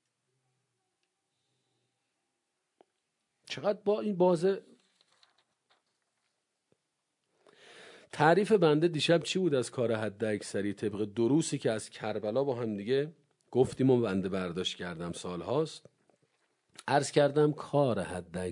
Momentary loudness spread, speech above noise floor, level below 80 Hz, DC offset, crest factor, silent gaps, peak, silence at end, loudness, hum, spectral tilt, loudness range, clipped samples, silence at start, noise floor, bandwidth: 12 LU; 53 dB; -74 dBFS; under 0.1%; 22 dB; none; -10 dBFS; 0 s; -30 LUFS; none; -5.5 dB/octave; 6 LU; under 0.1%; 3.45 s; -83 dBFS; 11 kHz